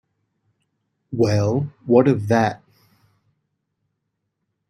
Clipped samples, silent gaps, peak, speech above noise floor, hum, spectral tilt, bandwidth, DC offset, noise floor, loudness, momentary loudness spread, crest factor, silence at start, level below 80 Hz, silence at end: under 0.1%; none; -2 dBFS; 59 dB; none; -7.5 dB/octave; 10.5 kHz; under 0.1%; -76 dBFS; -19 LUFS; 11 LU; 20 dB; 1.1 s; -58 dBFS; 2.15 s